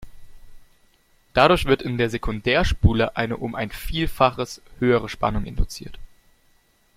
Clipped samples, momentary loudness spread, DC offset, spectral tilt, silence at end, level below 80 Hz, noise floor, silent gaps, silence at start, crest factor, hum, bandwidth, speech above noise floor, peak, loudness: under 0.1%; 13 LU; under 0.1%; -6 dB/octave; 0.9 s; -32 dBFS; -60 dBFS; none; 0 s; 20 dB; none; 16.5 kHz; 39 dB; -2 dBFS; -22 LUFS